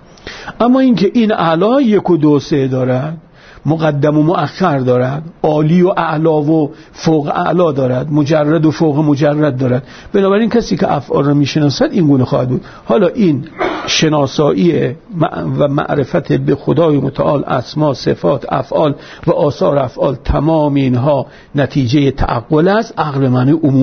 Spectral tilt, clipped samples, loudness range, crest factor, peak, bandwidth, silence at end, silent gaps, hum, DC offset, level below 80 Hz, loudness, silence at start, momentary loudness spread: -7 dB/octave; under 0.1%; 2 LU; 12 dB; 0 dBFS; 6.6 kHz; 0 s; none; none; under 0.1%; -36 dBFS; -13 LUFS; 0.25 s; 6 LU